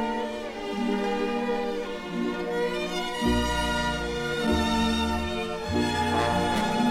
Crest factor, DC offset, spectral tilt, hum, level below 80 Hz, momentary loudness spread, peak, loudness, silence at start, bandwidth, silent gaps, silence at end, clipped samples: 16 dB; under 0.1%; -5 dB/octave; none; -40 dBFS; 6 LU; -12 dBFS; -27 LUFS; 0 s; 16 kHz; none; 0 s; under 0.1%